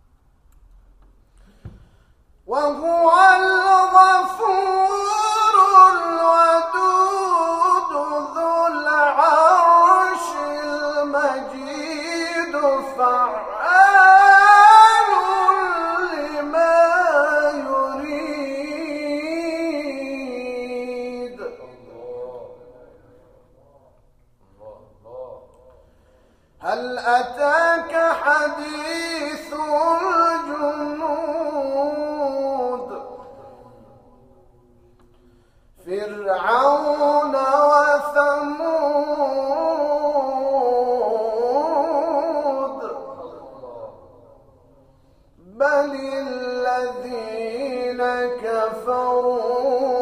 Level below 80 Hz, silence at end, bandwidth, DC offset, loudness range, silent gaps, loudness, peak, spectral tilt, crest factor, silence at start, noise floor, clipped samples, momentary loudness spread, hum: -56 dBFS; 0 s; 14.5 kHz; under 0.1%; 16 LU; none; -18 LUFS; 0 dBFS; -2.5 dB/octave; 18 dB; 1.65 s; -56 dBFS; under 0.1%; 16 LU; none